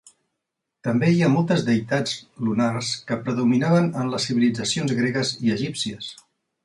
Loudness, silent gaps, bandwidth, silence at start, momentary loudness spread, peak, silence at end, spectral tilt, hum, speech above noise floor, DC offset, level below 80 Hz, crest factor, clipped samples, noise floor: -22 LUFS; none; 11.5 kHz; 0.85 s; 9 LU; -8 dBFS; 0.5 s; -5.5 dB/octave; none; 60 dB; under 0.1%; -60 dBFS; 16 dB; under 0.1%; -81 dBFS